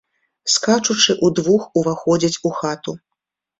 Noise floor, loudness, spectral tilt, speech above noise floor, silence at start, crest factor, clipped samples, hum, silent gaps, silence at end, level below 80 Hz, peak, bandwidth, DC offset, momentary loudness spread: -81 dBFS; -17 LUFS; -3.5 dB/octave; 63 dB; 0.45 s; 18 dB; under 0.1%; none; none; 0.65 s; -58 dBFS; 0 dBFS; 8.2 kHz; under 0.1%; 13 LU